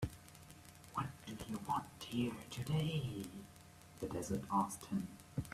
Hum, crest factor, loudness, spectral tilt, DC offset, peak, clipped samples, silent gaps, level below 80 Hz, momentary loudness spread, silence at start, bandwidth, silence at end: none; 20 dB; -42 LUFS; -5.5 dB/octave; under 0.1%; -22 dBFS; under 0.1%; none; -64 dBFS; 19 LU; 0 s; 15.5 kHz; 0 s